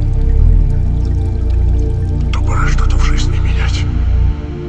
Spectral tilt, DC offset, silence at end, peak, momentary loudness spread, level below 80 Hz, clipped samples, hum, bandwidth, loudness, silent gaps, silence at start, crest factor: -6.5 dB/octave; under 0.1%; 0 s; 0 dBFS; 3 LU; -12 dBFS; under 0.1%; none; 8.2 kHz; -15 LUFS; none; 0 s; 12 dB